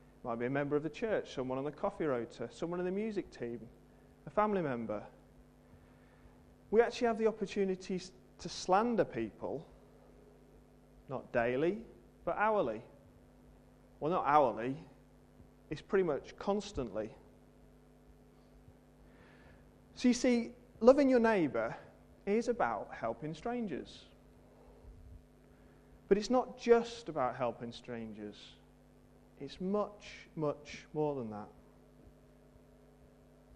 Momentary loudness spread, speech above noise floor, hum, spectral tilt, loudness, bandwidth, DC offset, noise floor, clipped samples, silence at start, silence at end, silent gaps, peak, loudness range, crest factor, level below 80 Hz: 17 LU; 28 dB; none; -6 dB/octave; -35 LUFS; 10.5 kHz; under 0.1%; -62 dBFS; under 0.1%; 0.25 s; 1.45 s; none; -10 dBFS; 10 LU; 26 dB; -62 dBFS